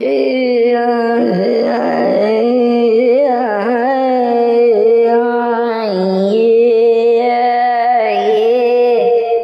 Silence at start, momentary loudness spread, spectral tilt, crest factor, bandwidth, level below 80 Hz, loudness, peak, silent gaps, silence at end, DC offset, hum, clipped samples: 0 s; 4 LU; -7.5 dB/octave; 8 dB; 5.6 kHz; -78 dBFS; -12 LUFS; -4 dBFS; none; 0 s; under 0.1%; none; under 0.1%